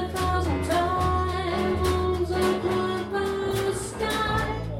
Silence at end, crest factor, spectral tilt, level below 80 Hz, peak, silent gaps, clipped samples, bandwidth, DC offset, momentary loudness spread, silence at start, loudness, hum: 0 s; 14 dB; -5.5 dB/octave; -36 dBFS; -12 dBFS; none; under 0.1%; 16.5 kHz; under 0.1%; 3 LU; 0 s; -26 LUFS; none